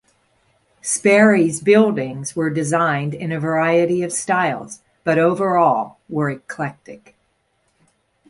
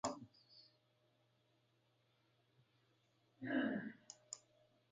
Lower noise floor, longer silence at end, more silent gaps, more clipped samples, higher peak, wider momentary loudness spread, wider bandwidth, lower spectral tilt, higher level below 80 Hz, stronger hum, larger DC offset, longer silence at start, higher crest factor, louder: second, -66 dBFS vs -79 dBFS; first, 1.3 s vs 0.55 s; neither; neither; first, -2 dBFS vs -26 dBFS; second, 13 LU vs 24 LU; first, 11.5 kHz vs 9 kHz; first, -5.5 dB/octave vs -4 dB/octave; first, -62 dBFS vs -86 dBFS; neither; neither; first, 0.85 s vs 0.05 s; second, 18 dB vs 24 dB; first, -18 LUFS vs -46 LUFS